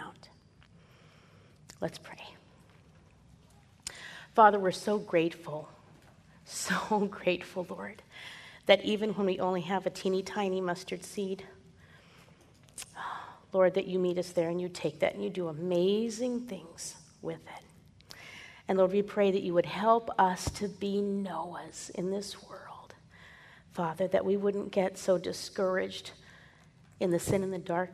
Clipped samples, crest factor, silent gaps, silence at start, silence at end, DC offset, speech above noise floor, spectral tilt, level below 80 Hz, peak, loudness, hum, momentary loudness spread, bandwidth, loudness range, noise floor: under 0.1%; 26 dB; none; 0 s; 0 s; under 0.1%; 29 dB; -5 dB/octave; -62 dBFS; -6 dBFS; -31 LUFS; none; 19 LU; 13.5 kHz; 8 LU; -60 dBFS